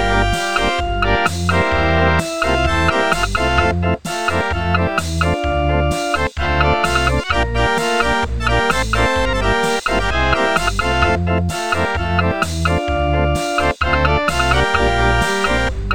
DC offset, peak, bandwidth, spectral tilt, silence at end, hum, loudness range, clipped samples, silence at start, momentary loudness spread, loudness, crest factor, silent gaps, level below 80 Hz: 2%; -2 dBFS; 17 kHz; -5 dB/octave; 0 s; none; 1 LU; under 0.1%; 0 s; 3 LU; -17 LUFS; 16 dB; none; -24 dBFS